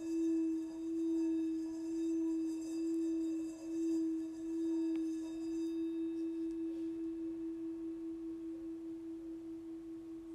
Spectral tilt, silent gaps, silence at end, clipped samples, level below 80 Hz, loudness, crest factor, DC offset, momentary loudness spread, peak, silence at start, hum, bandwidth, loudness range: -6 dB/octave; none; 0 s; under 0.1%; -72 dBFS; -40 LUFS; 10 dB; under 0.1%; 10 LU; -30 dBFS; 0 s; none; 10 kHz; 6 LU